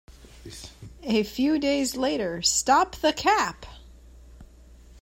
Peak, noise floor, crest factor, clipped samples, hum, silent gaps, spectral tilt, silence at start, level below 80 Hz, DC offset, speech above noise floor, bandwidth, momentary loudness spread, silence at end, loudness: -8 dBFS; -50 dBFS; 18 dB; under 0.1%; none; none; -2.5 dB/octave; 0.1 s; -50 dBFS; under 0.1%; 26 dB; 16 kHz; 22 LU; 0 s; -24 LUFS